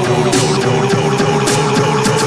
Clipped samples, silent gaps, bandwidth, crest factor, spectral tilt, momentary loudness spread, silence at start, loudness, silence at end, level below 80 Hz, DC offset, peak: under 0.1%; none; 11 kHz; 12 dB; -4.5 dB/octave; 1 LU; 0 s; -13 LUFS; 0 s; -44 dBFS; 0.4%; -2 dBFS